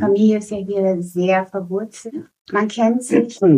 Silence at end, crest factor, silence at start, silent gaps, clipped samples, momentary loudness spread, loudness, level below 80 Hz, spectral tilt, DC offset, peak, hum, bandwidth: 0 s; 16 dB; 0 s; 2.41-2.45 s; under 0.1%; 14 LU; -19 LUFS; -62 dBFS; -6.5 dB/octave; under 0.1%; -2 dBFS; none; 15 kHz